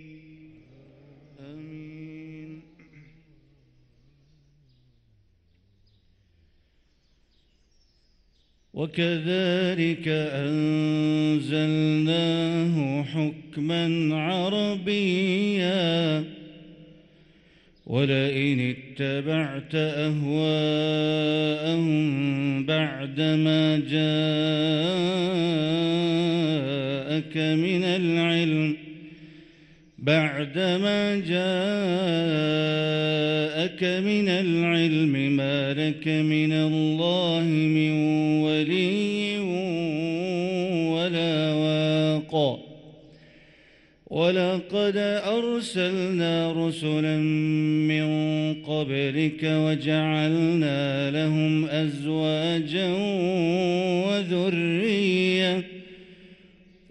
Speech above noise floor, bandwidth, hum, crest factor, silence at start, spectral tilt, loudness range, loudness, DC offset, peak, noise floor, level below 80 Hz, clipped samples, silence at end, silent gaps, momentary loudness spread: 41 dB; 10.5 kHz; none; 16 dB; 0 s; -6.5 dB/octave; 4 LU; -24 LUFS; under 0.1%; -8 dBFS; -64 dBFS; -64 dBFS; under 0.1%; 0.55 s; none; 5 LU